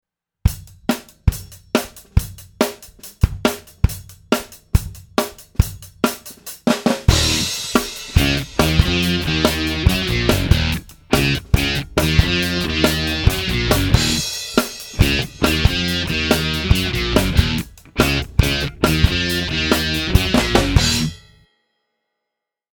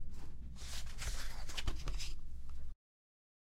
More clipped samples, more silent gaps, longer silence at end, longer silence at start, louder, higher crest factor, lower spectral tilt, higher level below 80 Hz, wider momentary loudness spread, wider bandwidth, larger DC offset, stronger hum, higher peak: neither; neither; first, 1.6 s vs 0.8 s; first, 0.45 s vs 0 s; first, -18 LUFS vs -47 LUFS; about the same, 18 dB vs 16 dB; first, -4.5 dB/octave vs -3 dB/octave; first, -26 dBFS vs -44 dBFS; second, 7 LU vs 10 LU; first, over 20 kHz vs 13 kHz; neither; neither; first, 0 dBFS vs -22 dBFS